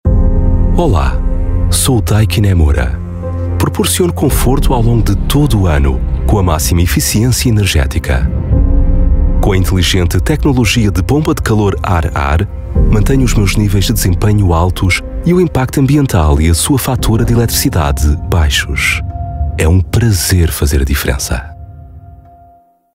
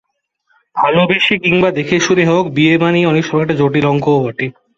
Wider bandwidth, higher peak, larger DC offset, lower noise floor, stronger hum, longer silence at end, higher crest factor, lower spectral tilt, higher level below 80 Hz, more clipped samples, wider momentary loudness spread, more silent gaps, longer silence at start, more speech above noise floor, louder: first, 16.5 kHz vs 7.6 kHz; about the same, 0 dBFS vs 0 dBFS; neither; second, -45 dBFS vs -63 dBFS; neither; first, 0.8 s vs 0.25 s; about the same, 10 dB vs 12 dB; about the same, -5.5 dB/octave vs -5.5 dB/octave; first, -16 dBFS vs -50 dBFS; neither; about the same, 5 LU vs 4 LU; neither; second, 0.05 s vs 0.75 s; second, 35 dB vs 50 dB; about the same, -12 LUFS vs -13 LUFS